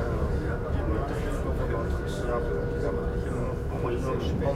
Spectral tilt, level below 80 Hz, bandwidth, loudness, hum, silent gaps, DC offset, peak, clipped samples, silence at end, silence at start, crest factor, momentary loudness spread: -7.5 dB/octave; -32 dBFS; 14 kHz; -30 LUFS; none; none; under 0.1%; -14 dBFS; under 0.1%; 0 s; 0 s; 14 dB; 2 LU